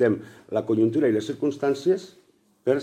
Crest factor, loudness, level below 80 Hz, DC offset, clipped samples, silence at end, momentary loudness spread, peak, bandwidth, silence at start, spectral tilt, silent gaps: 16 dB; -25 LUFS; -70 dBFS; under 0.1%; under 0.1%; 0 s; 9 LU; -8 dBFS; 9.6 kHz; 0 s; -7 dB/octave; none